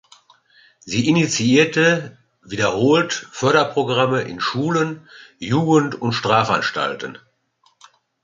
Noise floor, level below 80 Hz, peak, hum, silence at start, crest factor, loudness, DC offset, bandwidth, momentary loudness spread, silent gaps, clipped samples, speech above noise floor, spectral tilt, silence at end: -62 dBFS; -58 dBFS; -2 dBFS; none; 0.85 s; 18 dB; -18 LUFS; under 0.1%; 9.4 kHz; 10 LU; none; under 0.1%; 43 dB; -5 dB/octave; 1.1 s